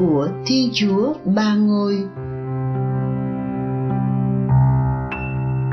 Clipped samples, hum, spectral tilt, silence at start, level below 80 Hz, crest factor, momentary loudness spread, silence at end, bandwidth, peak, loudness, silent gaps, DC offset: under 0.1%; none; -7.5 dB/octave; 0 s; -38 dBFS; 12 dB; 8 LU; 0 s; 6.4 kHz; -6 dBFS; -20 LUFS; none; under 0.1%